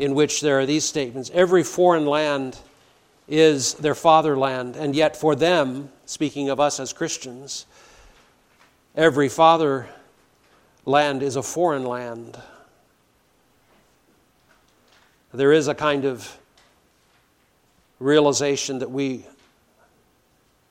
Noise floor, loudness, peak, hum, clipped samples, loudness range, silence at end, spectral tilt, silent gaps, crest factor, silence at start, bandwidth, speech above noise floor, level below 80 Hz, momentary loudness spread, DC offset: -62 dBFS; -20 LUFS; -2 dBFS; none; under 0.1%; 7 LU; 1.5 s; -4 dB/octave; none; 20 dB; 0 s; 16 kHz; 42 dB; -62 dBFS; 17 LU; under 0.1%